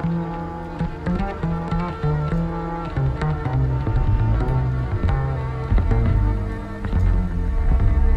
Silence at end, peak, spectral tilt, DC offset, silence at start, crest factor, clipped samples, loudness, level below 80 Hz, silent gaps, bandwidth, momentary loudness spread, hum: 0 s; -6 dBFS; -9.5 dB/octave; under 0.1%; 0 s; 14 dB; under 0.1%; -23 LUFS; -24 dBFS; none; 5.6 kHz; 7 LU; none